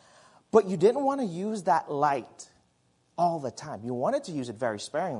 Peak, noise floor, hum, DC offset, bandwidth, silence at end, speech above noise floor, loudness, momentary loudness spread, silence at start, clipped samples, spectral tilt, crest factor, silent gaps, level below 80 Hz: -6 dBFS; -69 dBFS; none; under 0.1%; 11 kHz; 0 s; 41 dB; -28 LUFS; 13 LU; 0.55 s; under 0.1%; -6 dB/octave; 22 dB; none; -74 dBFS